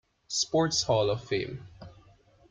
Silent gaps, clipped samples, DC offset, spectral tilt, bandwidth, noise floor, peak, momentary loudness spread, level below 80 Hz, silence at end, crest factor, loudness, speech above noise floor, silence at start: none; under 0.1%; under 0.1%; -3.5 dB/octave; 10 kHz; -59 dBFS; -14 dBFS; 16 LU; -58 dBFS; 0.6 s; 18 dB; -28 LUFS; 31 dB; 0.3 s